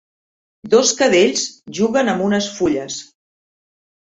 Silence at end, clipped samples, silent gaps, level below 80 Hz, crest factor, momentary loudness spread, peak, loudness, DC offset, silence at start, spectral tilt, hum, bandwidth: 1.15 s; under 0.1%; none; -56 dBFS; 18 dB; 11 LU; -2 dBFS; -16 LUFS; under 0.1%; 0.65 s; -3 dB/octave; none; 8.2 kHz